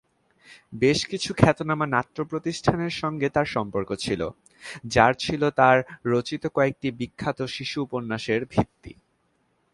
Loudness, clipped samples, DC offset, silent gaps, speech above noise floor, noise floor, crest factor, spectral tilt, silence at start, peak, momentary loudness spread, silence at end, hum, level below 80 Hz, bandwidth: -24 LUFS; under 0.1%; under 0.1%; none; 45 dB; -69 dBFS; 24 dB; -5.5 dB/octave; 0.5 s; 0 dBFS; 10 LU; 0.85 s; none; -50 dBFS; 11.5 kHz